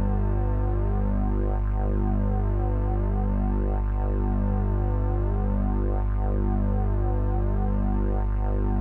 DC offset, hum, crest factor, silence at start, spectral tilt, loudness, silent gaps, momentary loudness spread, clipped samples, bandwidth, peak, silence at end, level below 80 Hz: under 0.1%; 50 Hz at -25 dBFS; 8 dB; 0 s; -12 dB/octave; -27 LUFS; none; 1 LU; under 0.1%; 2.8 kHz; -16 dBFS; 0 s; -24 dBFS